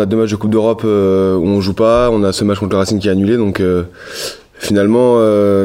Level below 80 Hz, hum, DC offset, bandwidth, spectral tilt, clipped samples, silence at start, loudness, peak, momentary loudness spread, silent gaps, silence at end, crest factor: -38 dBFS; none; under 0.1%; 16 kHz; -6.5 dB/octave; under 0.1%; 0 s; -13 LUFS; -2 dBFS; 12 LU; none; 0 s; 12 dB